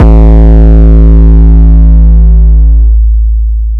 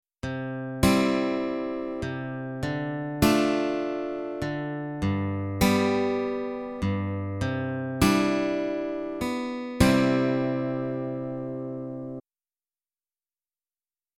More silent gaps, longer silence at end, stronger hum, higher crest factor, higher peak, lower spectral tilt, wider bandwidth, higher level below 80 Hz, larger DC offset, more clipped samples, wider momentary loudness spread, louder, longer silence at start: neither; second, 0 s vs 1.95 s; neither; second, 2 dB vs 22 dB; first, 0 dBFS vs -6 dBFS; first, -11.5 dB/octave vs -6 dB/octave; second, 2.1 kHz vs 16 kHz; first, -2 dBFS vs -46 dBFS; neither; first, 60% vs under 0.1%; second, 5 LU vs 11 LU; first, -5 LUFS vs -27 LUFS; second, 0 s vs 0.25 s